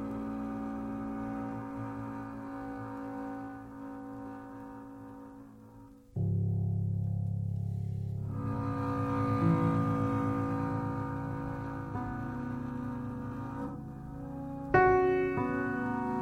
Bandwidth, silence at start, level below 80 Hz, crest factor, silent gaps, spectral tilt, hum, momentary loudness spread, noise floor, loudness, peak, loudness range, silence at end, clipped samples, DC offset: 8.4 kHz; 0 s; -52 dBFS; 22 dB; none; -9.5 dB/octave; none; 16 LU; -54 dBFS; -34 LUFS; -12 dBFS; 11 LU; 0 s; under 0.1%; under 0.1%